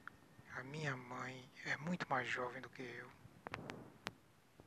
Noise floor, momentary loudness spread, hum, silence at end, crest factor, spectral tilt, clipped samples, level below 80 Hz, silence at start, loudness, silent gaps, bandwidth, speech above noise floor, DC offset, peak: -67 dBFS; 13 LU; none; 0 s; 28 dB; -5 dB/octave; under 0.1%; -78 dBFS; 0 s; -46 LUFS; none; 13 kHz; 22 dB; under 0.1%; -18 dBFS